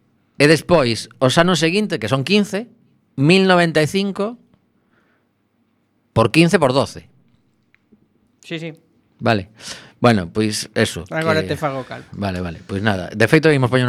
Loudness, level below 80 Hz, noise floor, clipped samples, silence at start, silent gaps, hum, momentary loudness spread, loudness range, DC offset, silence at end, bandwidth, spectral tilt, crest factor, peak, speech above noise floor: -17 LUFS; -50 dBFS; -64 dBFS; under 0.1%; 0.4 s; none; none; 16 LU; 6 LU; under 0.1%; 0 s; 15 kHz; -5.5 dB/octave; 18 dB; 0 dBFS; 47 dB